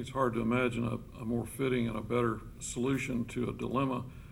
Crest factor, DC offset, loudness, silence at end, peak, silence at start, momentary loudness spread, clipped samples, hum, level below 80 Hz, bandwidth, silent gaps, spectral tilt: 16 dB; under 0.1%; -33 LUFS; 0 s; -16 dBFS; 0 s; 7 LU; under 0.1%; none; -52 dBFS; 16.5 kHz; none; -6 dB/octave